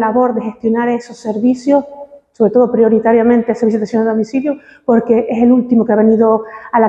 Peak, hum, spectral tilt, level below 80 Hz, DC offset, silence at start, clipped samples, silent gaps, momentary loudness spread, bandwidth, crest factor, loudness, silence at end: 0 dBFS; none; -8 dB/octave; -52 dBFS; under 0.1%; 0 s; under 0.1%; none; 8 LU; 8 kHz; 12 dB; -13 LUFS; 0 s